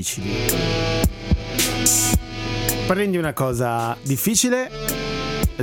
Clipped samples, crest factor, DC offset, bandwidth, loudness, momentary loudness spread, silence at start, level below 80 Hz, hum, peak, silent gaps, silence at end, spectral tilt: under 0.1%; 18 dB; under 0.1%; 18 kHz; -21 LUFS; 8 LU; 0 s; -32 dBFS; none; -2 dBFS; none; 0 s; -3.5 dB/octave